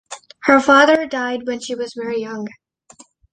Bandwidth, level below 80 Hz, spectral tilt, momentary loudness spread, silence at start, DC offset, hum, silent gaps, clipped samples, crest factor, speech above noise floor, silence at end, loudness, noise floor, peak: 9.8 kHz; -58 dBFS; -3.5 dB/octave; 18 LU; 0.1 s; under 0.1%; none; none; under 0.1%; 18 dB; 32 dB; 0.85 s; -16 LUFS; -49 dBFS; 0 dBFS